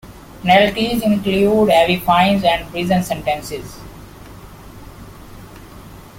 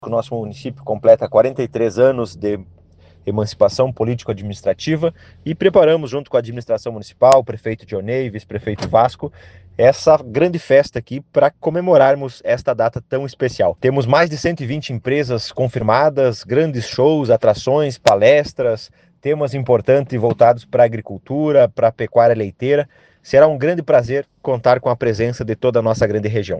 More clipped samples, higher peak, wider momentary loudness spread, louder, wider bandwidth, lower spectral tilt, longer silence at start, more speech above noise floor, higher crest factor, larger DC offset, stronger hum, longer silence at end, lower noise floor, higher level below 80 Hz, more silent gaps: neither; about the same, 0 dBFS vs 0 dBFS; first, 17 LU vs 12 LU; about the same, -15 LUFS vs -16 LUFS; first, 17 kHz vs 9 kHz; about the same, -5.5 dB/octave vs -6.5 dB/octave; about the same, 0.05 s vs 0 s; second, 22 dB vs 32 dB; about the same, 18 dB vs 16 dB; neither; neither; about the same, 0 s vs 0 s; second, -38 dBFS vs -48 dBFS; first, -40 dBFS vs -50 dBFS; neither